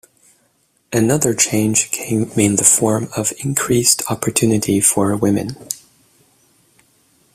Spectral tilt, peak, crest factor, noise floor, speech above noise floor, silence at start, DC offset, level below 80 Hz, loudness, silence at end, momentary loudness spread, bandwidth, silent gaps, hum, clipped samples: -4 dB/octave; 0 dBFS; 18 dB; -61 dBFS; 45 dB; 0.9 s; under 0.1%; -50 dBFS; -15 LUFS; 1.55 s; 10 LU; 16 kHz; none; none; under 0.1%